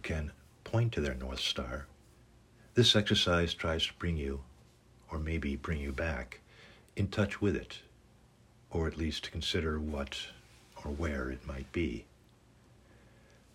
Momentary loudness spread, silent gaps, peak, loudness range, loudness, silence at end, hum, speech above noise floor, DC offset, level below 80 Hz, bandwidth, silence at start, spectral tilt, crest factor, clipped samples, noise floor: 18 LU; none; -12 dBFS; 8 LU; -34 LUFS; 1.5 s; none; 29 dB; under 0.1%; -48 dBFS; 16 kHz; 0 s; -5 dB/octave; 22 dB; under 0.1%; -62 dBFS